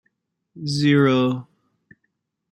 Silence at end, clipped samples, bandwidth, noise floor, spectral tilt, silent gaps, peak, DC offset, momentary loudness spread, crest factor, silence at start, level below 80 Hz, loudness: 1.1 s; under 0.1%; 11.5 kHz; -74 dBFS; -6.5 dB/octave; none; -6 dBFS; under 0.1%; 15 LU; 18 dB; 0.55 s; -62 dBFS; -19 LUFS